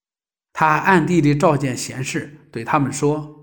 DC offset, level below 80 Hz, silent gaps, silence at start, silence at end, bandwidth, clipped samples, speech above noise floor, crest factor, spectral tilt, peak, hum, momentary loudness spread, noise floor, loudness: under 0.1%; -50 dBFS; none; 0.55 s; 0.1 s; 19 kHz; under 0.1%; over 72 dB; 18 dB; -5.5 dB/octave; -2 dBFS; none; 14 LU; under -90 dBFS; -18 LUFS